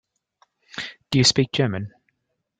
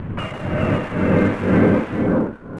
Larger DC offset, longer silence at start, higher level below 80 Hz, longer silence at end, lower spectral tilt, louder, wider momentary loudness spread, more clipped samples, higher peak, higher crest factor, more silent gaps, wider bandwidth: neither; first, 0.75 s vs 0 s; second, -56 dBFS vs -38 dBFS; first, 0.7 s vs 0 s; second, -4 dB/octave vs -9 dB/octave; about the same, -20 LUFS vs -19 LUFS; first, 19 LU vs 9 LU; neither; about the same, -4 dBFS vs -4 dBFS; about the same, 20 dB vs 16 dB; neither; second, 9.6 kHz vs 11 kHz